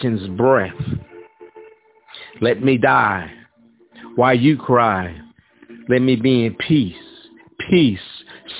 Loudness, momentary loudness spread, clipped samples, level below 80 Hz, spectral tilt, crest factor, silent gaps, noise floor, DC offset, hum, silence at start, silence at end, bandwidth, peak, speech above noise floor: -17 LUFS; 20 LU; under 0.1%; -48 dBFS; -10.5 dB/octave; 18 dB; none; -53 dBFS; under 0.1%; none; 0 s; 0 s; 4 kHz; -2 dBFS; 37 dB